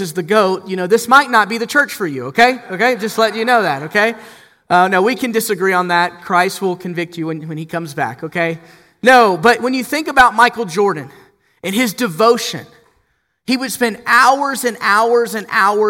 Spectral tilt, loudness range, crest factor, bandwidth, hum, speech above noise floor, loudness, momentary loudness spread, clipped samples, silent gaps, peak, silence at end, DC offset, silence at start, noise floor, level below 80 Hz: -4 dB/octave; 4 LU; 16 dB; 17 kHz; none; 48 dB; -14 LUFS; 12 LU; under 0.1%; none; 0 dBFS; 0 s; under 0.1%; 0 s; -63 dBFS; -52 dBFS